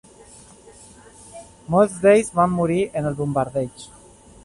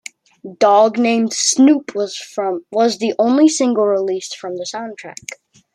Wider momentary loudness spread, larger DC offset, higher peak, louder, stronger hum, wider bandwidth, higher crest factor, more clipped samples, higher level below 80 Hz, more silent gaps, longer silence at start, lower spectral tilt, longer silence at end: first, 25 LU vs 18 LU; neither; about the same, -4 dBFS vs -2 dBFS; second, -20 LUFS vs -16 LUFS; neither; about the same, 11.5 kHz vs 12.5 kHz; about the same, 18 dB vs 16 dB; neither; first, -52 dBFS vs -68 dBFS; neither; first, 1.35 s vs 0.45 s; first, -6.5 dB/octave vs -3 dB/octave; first, 0.6 s vs 0.4 s